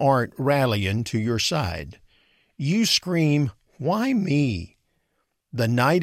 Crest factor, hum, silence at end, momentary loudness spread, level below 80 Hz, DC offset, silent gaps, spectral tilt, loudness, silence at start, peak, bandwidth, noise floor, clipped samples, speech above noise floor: 16 dB; none; 0 s; 11 LU; -50 dBFS; under 0.1%; none; -5.5 dB/octave; -23 LUFS; 0 s; -6 dBFS; 16 kHz; -74 dBFS; under 0.1%; 52 dB